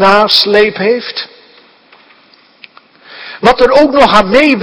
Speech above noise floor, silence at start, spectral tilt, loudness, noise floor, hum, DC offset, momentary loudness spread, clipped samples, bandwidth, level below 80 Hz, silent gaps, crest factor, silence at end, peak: 37 dB; 0 s; -4.5 dB/octave; -8 LUFS; -45 dBFS; none; under 0.1%; 18 LU; 2%; 11 kHz; -38 dBFS; none; 10 dB; 0 s; 0 dBFS